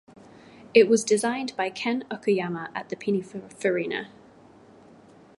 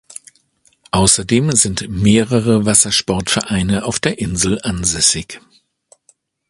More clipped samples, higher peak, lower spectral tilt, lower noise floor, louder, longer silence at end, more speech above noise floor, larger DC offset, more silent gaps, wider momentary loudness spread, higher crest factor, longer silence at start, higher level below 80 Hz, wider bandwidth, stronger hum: neither; second, -4 dBFS vs 0 dBFS; about the same, -4.5 dB/octave vs -3.5 dB/octave; second, -52 dBFS vs -57 dBFS; second, -25 LUFS vs -14 LUFS; first, 1.35 s vs 1.1 s; second, 27 dB vs 42 dB; neither; neither; first, 14 LU vs 9 LU; first, 24 dB vs 16 dB; second, 0.75 s vs 0.95 s; second, -72 dBFS vs -36 dBFS; second, 11.5 kHz vs 13 kHz; neither